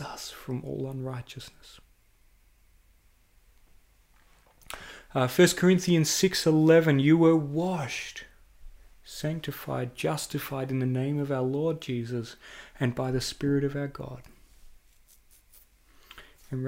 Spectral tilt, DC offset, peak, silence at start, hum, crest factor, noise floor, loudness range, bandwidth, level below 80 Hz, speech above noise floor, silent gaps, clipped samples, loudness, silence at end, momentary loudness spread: -5.5 dB/octave; under 0.1%; -8 dBFS; 0 s; none; 20 dB; -62 dBFS; 16 LU; 16 kHz; -56 dBFS; 35 dB; none; under 0.1%; -27 LUFS; 0 s; 22 LU